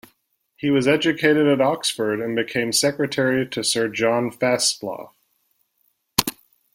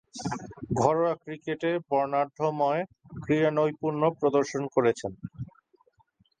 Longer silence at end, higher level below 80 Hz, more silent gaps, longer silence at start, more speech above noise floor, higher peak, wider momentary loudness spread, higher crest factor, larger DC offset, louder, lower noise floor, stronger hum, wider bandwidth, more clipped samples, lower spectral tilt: second, 0.45 s vs 0.95 s; about the same, -58 dBFS vs -60 dBFS; neither; first, 0.6 s vs 0.15 s; first, 48 dB vs 40 dB; first, 0 dBFS vs -8 dBFS; second, 6 LU vs 14 LU; about the same, 22 dB vs 20 dB; neither; first, -20 LUFS vs -27 LUFS; about the same, -68 dBFS vs -67 dBFS; neither; first, 16.5 kHz vs 9.6 kHz; neither; second, -3.5 dB/octave vs -6.5 dB/octave